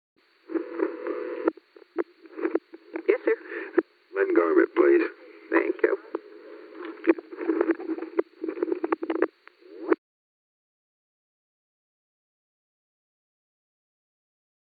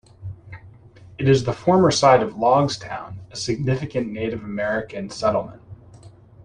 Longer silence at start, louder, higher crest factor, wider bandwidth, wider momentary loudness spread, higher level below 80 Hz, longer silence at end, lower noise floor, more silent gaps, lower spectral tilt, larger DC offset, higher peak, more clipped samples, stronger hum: first, 0.5 s vs 0.2 s; second, -27 LUFS vs -20 LUFS; about the same, 24 dB vs 20 dB; second, 4.8 kHz vs 10.5 kHz; second, 16 LU vs 19 LU; second, -84 dBFS vs -50 dBFS; first, 4.85 s vs 0.35 s; first, -51 dBFS vs -46 dBFS; neither; first, -7.5 dB/octave vs -5.5 dB/octave; neither; second, -6 dBFS vs -2 dBFS; neither; neither